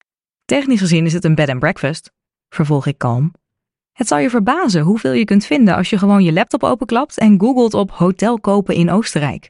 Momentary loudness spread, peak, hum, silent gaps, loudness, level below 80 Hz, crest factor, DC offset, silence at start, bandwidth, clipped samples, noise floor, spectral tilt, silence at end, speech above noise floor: 7 LU; -2 dBFS; none; none; -15 LUFS; -48 dBFS; 12 dB; under 0.1%; 0.5 s; 11 kHz; under 0.1%; -81 dBFS; -6.5 dB/octave; 0.1 s; 68 dB